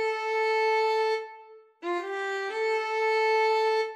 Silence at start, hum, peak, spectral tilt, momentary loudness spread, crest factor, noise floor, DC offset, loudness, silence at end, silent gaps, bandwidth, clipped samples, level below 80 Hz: 0 s; none; -16 dBFS; 0 dB/octave; 9 LU; 12 dB; -51 dBFS; under 0.1%; -27 LUFS; 0 s; none; 11.5 kHz; under 0.1%; under -90 dBFS